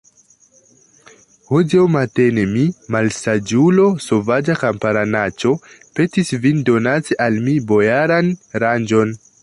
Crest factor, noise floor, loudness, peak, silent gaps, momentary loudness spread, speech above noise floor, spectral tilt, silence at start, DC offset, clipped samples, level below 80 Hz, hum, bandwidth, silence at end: 14 dB; -52 dBFS; -16 LUFS; -2 dBFS; none; 6 LU; 37 dB; -6.5 dB/octave; 1.5 s; under 0.1%; under 0.1%; -52 dBFS; none; 11.5 kHz; 0.25 s